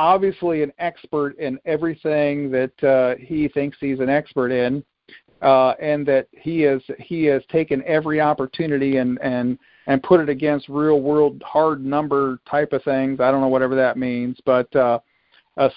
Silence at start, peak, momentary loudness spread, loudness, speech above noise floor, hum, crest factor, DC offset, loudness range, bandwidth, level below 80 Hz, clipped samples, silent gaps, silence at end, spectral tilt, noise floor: 0 s; -2 dBFS; 7 LU; -20 LUFS; 33 dB; none; 18 dB; under 0.1%; 2 LU; 5.2 kHz; -56 dBFS; under 0.1%; none; 0.05 s; -11.5 dB/octave; -52 dBFS